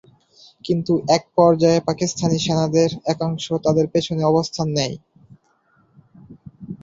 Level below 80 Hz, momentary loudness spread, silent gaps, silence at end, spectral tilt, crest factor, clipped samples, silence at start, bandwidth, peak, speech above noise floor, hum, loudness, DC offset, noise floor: -54 dBFS; 9 LU; none; 0.05 s; -6 dB/octave; 20 dB; under 0.1%; 0.65 s; 7.8 kHz; -2 dBFS; 42 dB; none; -19 LUFS; under 0.1%; -61 dBFS